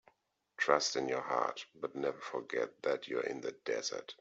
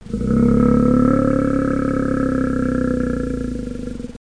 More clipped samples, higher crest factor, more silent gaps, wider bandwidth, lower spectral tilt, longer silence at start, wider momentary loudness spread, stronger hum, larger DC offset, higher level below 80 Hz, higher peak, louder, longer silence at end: neither; first, 24 dB vs 14 dB; neither; second, 8 kHz vs 10.5 kHz; second, -2.5 dB/octave vs -9 dB/octave; first, 0.6 s vs 0.05 s; about the same, 10 LU vs 12 LU; neither; second, under 0.1% vs 0.6%; second, -84 dBFS vs -30 dBFS; second, -12 dBFS vs -4 dBFS; second, -36 LUFS vs -18 LUFS; about the same, 0.05 s vs 0.05 s